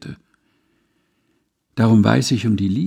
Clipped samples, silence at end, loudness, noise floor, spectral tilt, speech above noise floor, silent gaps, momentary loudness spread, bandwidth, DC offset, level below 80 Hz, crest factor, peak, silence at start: under 0.1%; 0 s; -16 LUFS; -67 dBFS; -6.5 dB/octave; 52 dB; none; 17 LU; 13 kHz; under 0.1%; -56 dBFS; 18 dB; -2 dBFS; 0 s